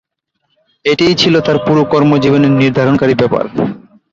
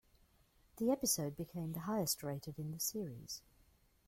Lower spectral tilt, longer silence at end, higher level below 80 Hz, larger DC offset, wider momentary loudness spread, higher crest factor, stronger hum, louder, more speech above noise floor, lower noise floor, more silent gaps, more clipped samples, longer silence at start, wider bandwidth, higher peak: first, -6.5 dB/octave vs -4 dB/octave; second, 0.35 s vs 0.7 s; first, -46 dBFS vs -68 dBFS; neither; second, 8 LU vs 11 LU; second, 12 dB vs 20 dB; neither; first, -11 LUFS vs -40 LUFS; first, 57 dB vs 31 dB; second, -67 dBFS vs -71 dBFS; neither; neither; about the same, 0.85 s vs 0.75 s; second, 7.6 kHz vs 16.5 kHz; first, 0 dBFS vs -22 dBFS